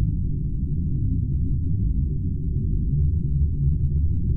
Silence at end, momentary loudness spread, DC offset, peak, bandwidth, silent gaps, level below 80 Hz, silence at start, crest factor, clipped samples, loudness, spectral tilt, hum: 0 s; 4 LU; under 0.1%; -10 dBFS; 0.5 kHz; none; -26 dBFS; 0 s; 12 dB; under 0.1%; -25 LUFS; -15 dB/octave; none